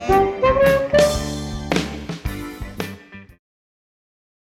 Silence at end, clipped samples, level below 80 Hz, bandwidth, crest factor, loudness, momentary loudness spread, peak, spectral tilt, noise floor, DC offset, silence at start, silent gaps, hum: 1.2 s; under 0.1%; -34 dBFS; 16.5 kHz; 18 dB; -19 LUFS; 16 LU; -4 dBFS; -5 dB/octave; -39 dBFS; under 0.1%; 0 s; none; none